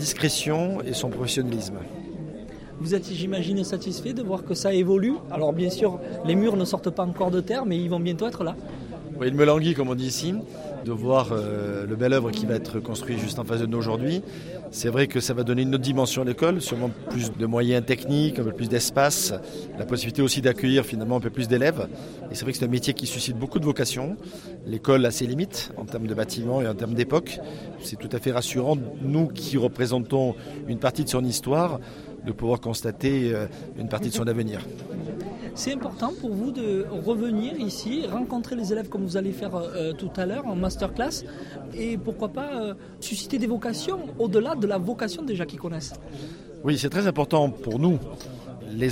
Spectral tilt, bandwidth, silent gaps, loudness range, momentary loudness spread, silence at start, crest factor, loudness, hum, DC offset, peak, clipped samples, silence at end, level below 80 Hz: -5.5 dB/octave; 16.5 kHz; none; 5 LU; 12 LU; 0 s; 20 dB; -26 LUFS; none; under 0.1%; -6 dBFS; under 0.1%; 0 s; -50 dBFS